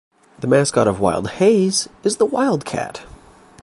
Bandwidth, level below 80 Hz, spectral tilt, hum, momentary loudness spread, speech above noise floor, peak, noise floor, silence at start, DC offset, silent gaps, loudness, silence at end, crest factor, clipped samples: 11.5 kHz; -48 dBFS; -4.5 dB/octave; none; 12 LU; 27 dB; -2 dBFS; -44 dBFS; 0.4 s; under 0.1%; none; -18 LUFS; 0.55 s; 16 dB; under 0.1%